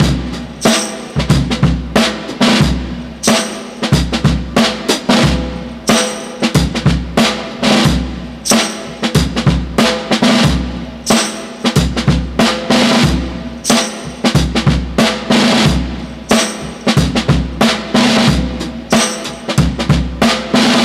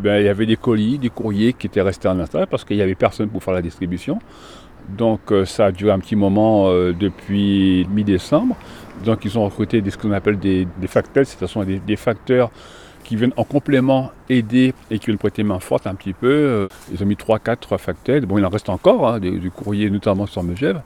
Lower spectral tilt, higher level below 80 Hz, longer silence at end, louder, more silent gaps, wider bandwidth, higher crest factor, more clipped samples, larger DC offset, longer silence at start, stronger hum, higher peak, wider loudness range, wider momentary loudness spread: second, -4.5 dB/octave vs -7.5 dB/octave; first, -24 dBFS vs -44 dBFS; about the same, 0 s vs 0 s; first, -14 LUFS vs -19 LUFS; neither; first, 15.5 kHz vs 13.5 kHz; about the same, 14 dB vs 18 dB; neither; neither; about the same, 0 s vs 0 s; neither; about the same, 0 dBFS vs 0 dBFS; about the same, 1 LU vs 3 LU; about the same, 9 LU vs 8 LU